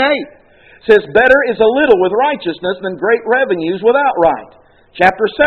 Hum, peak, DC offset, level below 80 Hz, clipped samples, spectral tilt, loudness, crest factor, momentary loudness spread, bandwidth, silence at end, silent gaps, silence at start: none; 0 dBFS; under 0.1%; -46 dBFS; 0.2%; -6.5 dB/octave; -13 LUFS; 12 dB; 10 LU; 6 kHz; 0 s; none; 0 s